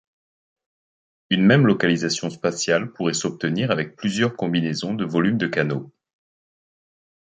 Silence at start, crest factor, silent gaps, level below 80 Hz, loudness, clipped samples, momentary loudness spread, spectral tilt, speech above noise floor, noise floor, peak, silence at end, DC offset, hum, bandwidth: 1.3 s; 20 dB; none; -62 dBFS; -21 LUFS; under 0.1%; 9 LU; -5 dB/octave; over 69 dB; under -90 dBFS; -4 dBFS; 1.5 s; under 0.1%; none; 9.6 kHz